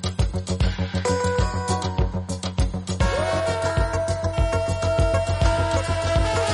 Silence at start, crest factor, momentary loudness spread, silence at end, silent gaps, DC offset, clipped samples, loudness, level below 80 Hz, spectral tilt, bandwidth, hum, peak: 0 s; 16 dB; 5 LU; 0 s; none; under 0.1%; under 0.1%; -23 LUFS; -28 dBFS; -5.5 dB/octave; 11.5 kHz; none; -6 dBFS